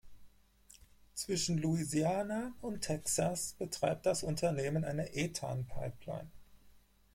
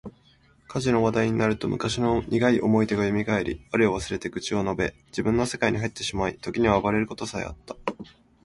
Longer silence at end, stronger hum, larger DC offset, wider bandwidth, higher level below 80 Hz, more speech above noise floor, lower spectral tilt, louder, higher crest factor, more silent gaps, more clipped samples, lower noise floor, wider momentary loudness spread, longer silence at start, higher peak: about the same, 0.35 s vs 0.4 s; neither; neither; first, 16.5 kHz vs 11.5 kHz; second, -58 dBFS vs -46 dBFS; second, 27 dB vs 34 dB; about the same, -4.5 dB/octave vs -5.5 dB/octave; second, -36 LUFS vs -25 LUFS; about the same, 18 dB vs 20 dB; neither; neither; first, -63 dBFS vs -59 dBFS; about the same, 10 LU vs 12 LU; about the same, 0.05 s vs 0.05 s; second, -20 dBFS vs -6 dBFS